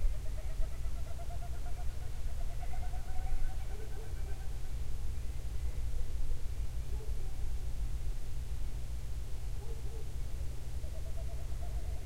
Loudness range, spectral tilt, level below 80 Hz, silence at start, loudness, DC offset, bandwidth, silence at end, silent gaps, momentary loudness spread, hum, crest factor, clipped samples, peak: 1 LU; -5.5 dB/octave; -36 dBFS; 0 s; -43 LUFS; 1%; 13.5 kHz; 0 s; none; 3 LU; none; 14 dB; under 0.1%; -20 dBFS